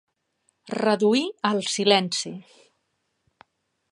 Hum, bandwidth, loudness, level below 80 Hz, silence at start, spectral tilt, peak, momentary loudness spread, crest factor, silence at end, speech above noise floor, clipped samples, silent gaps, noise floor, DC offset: none; 11.5 kHz; -23 LUFS; -78 dBFS; 0.65 s; -3.5 dB/octave; -2 dBFS; 14 LU; 24 dB; 1.5 s; 52 dB; under 0.1%; none; -75 dBFS; under 0.1%